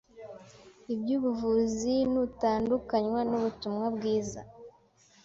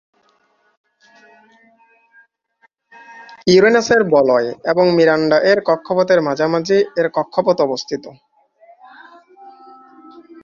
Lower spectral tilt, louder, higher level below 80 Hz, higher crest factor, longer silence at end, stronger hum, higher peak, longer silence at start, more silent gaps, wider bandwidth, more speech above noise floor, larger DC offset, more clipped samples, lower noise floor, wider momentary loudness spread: about the same, -6 dB/octave vs -5 dB/octave; second, -30 LUFS vs -15 LUFS; about the same, -58 dBFS vs -58 dBFS; about the same, 16 dB vs 16 dB; first, 0.55 s vs 0.25 s; neither; second, -14 dBFS vs -2 dBFS; second, 0.15 s vs 3.1 s; neither; about the same, 7.8 kHz vs 7.4 kHz; second, 33 dB vs 45 dB; neither; neither; about the same, -62 dBFS vs -60 dBFS; first, 19 LU vs 7 LU